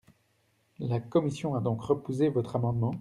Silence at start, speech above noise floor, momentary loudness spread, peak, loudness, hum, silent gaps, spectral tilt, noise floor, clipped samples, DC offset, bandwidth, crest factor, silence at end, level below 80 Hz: 0.8 s; 42 dB; 5 LU; -12 dBFS; -30 LUFS; none; none; -8.5 dB/octave; -71 dBFS; under 0.1%; under 0.1%; 11 kHz; 18 dB; 0 s; -62 dBFS